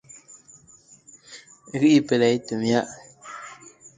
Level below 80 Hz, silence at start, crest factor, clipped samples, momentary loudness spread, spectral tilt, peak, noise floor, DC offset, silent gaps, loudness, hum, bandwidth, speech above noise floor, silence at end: -66 dBFS; 1.3 s; 20 dB; under 0.1%; 26 LU; -5.5 dB/octave; -6 dBFS; -53 dBFS; under 0.1%; none; -21 LUFS; none; 9.4 kHz; 33 dB; 0.45 s